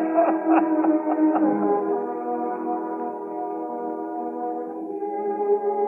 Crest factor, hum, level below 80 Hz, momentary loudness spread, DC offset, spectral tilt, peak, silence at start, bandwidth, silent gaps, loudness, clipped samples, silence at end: 16 dB; none; -86 dBFS; 10 LU; under 0.1%; -10 dB/octave; -6 dBFS; 0 s; 3 kHz; none; -24 LUFS; under 0.1%; 0 s